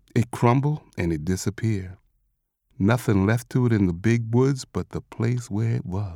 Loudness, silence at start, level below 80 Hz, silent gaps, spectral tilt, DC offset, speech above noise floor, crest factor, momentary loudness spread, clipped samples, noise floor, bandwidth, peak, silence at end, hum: -24 LUFS; 0.15 s; -50 dBFS; none; -7 dB/octave; under 0.1%; 50 dB; 18 dB; 8 LU; under 0.1%; -73 dBFS; 15 kHz; -6 dBFS; 0 s; none